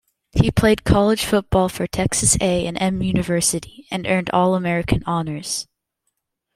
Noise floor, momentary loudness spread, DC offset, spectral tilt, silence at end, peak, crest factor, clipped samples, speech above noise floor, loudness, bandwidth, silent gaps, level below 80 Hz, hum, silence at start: -75 dBFS; 10 LU; under 0.1%; -4.5 dB/octave; 0.9 s; -2 dBFS; 18 dB; under 0.1%; 56 dB; -19 LUFS; 16 kHz; none; -36 dBFS; none; 0.35 s